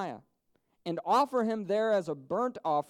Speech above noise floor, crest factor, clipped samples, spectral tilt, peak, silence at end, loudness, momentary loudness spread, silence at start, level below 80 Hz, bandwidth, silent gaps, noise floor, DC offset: 45 dB; 16 dB; under 0.1%; -6 dB/octave; -16 dBFS; 0.05 s; -30 LUFS; 13 LU; 0 s; -80 dBFS; 16 kHz; none; -75 dBFS; under 0.1%